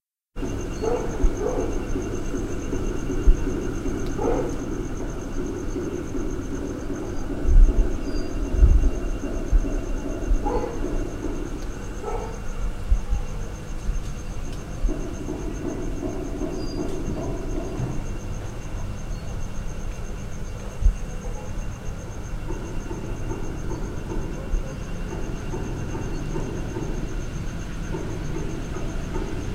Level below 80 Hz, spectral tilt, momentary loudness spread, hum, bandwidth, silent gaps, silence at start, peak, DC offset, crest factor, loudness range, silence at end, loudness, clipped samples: -26 dBFS; -6.5 dB/octave; 9 LU; none; 10.5 kHz; none; 0.35 s; -4 dBFS; under 0.1%; 20 dB; 7 LU; 0 s; -29 LUFS; under 0.1%